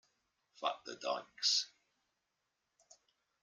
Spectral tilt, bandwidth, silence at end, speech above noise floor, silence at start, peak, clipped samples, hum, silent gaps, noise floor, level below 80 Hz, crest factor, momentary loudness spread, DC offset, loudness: 1 dB/octave; 13.5 kHz; 1.75 s; 48 dB; 0.6 s; -20 dBFS; under 0.1%; none; none; -86 dBFS; under -90 dBFS; 24 dB; 10 LU; under 0.1%; -37 LUFS